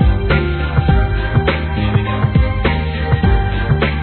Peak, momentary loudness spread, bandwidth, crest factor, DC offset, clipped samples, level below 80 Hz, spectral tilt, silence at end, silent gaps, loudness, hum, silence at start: 0 dBFS; 3 LU; 4.5 kHz; 14 dB; 0.3%; under 0.1%; -18 dBFS; -11 dB/octave; 0 s; none; -16 LUFS; none; 0 s